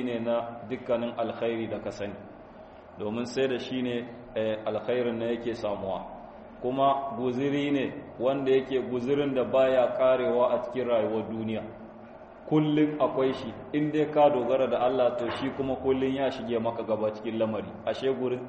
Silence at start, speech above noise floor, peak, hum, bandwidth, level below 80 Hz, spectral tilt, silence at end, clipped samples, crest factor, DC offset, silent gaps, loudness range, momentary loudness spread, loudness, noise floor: 0 s; 20 dB; -10 dBFS; none; 8.4 kHz; -60 dBFS; -7 dB/octave; 0 s; under 0.1%; 18 dB; under 0.1%; none; 6 LU; 13 LU; -28 LUFS; -48 dBFS